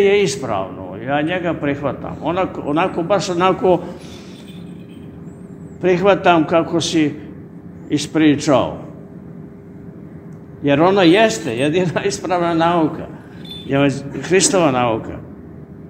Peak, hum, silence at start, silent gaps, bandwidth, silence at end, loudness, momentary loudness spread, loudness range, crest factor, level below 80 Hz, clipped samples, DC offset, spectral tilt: 0 dBFS; none; 0 s; none; 15.5 kHz; 0 s; -17 LUFS; 22 LU; 4 LU; 18 dB; -50 dBFS; under 0.1%; under 0.1%; -5 dB/octave